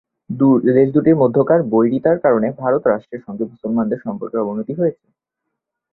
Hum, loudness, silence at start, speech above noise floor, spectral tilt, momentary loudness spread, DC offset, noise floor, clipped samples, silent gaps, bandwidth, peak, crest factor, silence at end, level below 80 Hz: none; -17 LUFS; 0.3 s; 63 dB; -12.5 dB/octave; 11 LU; under 0.1%; -79 dBFS; under 0.1%; none; 4.1 kHz; -2 dBFS; 16 dB; 1 s; -58 dBFS